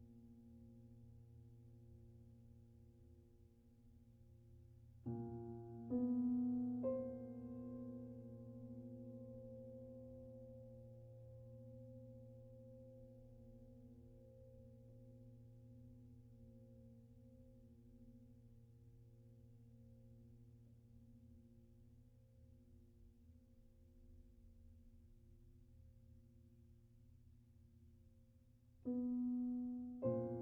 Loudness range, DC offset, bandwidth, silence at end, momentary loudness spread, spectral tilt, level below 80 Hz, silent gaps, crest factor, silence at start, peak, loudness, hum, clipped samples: 23 LU; under 0.1%; 2.2 kHz; 0 s; 25 LU; -11.5 dB/octave; -70 dBFS; none; 22 dB; 0 s; -30 dBFS; -48 LUFS; none; under 0.1%